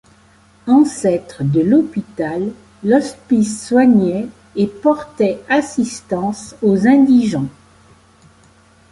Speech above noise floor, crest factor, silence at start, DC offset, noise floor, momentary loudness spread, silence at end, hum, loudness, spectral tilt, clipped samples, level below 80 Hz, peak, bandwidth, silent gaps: 35 dB; 14 dB; 0.65 s; under 0.1%; -49 dBFS; 12 LU; 1.4 s; none; -16 LUFS; -6.5 dB/octave; under 0.1%; -52 dBFS; -2 dBFS; 11.5 kHz; none